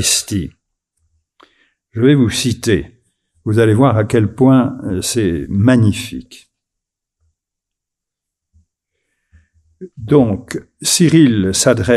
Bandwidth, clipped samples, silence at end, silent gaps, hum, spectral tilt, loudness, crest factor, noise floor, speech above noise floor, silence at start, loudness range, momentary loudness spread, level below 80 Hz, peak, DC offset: 14.5 kHz; under 0.1%; 0 s; none; none; -5 dB/octave; -14 LUFS; 16 dB; -82 dBFS; 69 dB; 0 s; 7 LU; 14 LU; -42 dBFS; 0 dBFS; under 0.1%